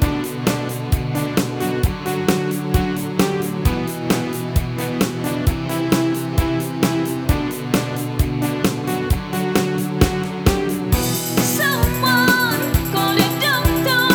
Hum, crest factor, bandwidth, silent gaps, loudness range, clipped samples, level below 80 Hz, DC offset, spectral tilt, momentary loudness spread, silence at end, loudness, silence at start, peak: none; 18 dB; over 20 kHz; none; 4 LU; under 0.1%; -28 dBFS; under 0.1%; -5 dB/octave; 5 LU; 0 s; -19 LUFS; 0 s; 0 dBFS